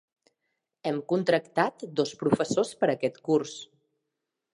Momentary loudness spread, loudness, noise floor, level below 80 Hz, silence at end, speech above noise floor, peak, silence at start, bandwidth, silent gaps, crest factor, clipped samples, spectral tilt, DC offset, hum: 7 LU; -28 LUFS; -84 dBFS; -70 dBFS; 0.9 s; 57 dB; -8 dBFS; 0.85 s; 11.5 kHz; none; 22 dB; under 0.1%; -5.5 dB/octave; under 0.1%; none